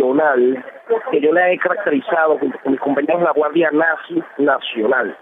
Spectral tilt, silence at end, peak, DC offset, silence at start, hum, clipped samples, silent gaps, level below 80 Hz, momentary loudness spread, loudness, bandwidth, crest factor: -8 dB/octave; 0.05 s; -4 dBFS; under 0.1%; 0 s; none; under 0.1%; none; -68 dBFS; 6 LU; -17 LUFS; 3.9 kHz; 12 dB